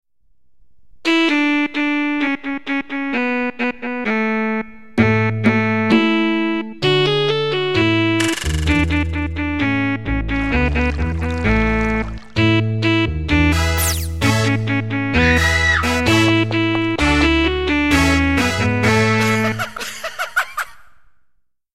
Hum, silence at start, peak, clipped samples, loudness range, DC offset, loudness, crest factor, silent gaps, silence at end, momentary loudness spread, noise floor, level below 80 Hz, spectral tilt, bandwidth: none; 0.05 s; -2 dBFS; under 0.1%; 4 LU; 1%; -17 LUFS; 16 dB; none; 0 s; 8 LU; -60 dBFS; -28 dBFS; -5 dB/octave; 16 kHz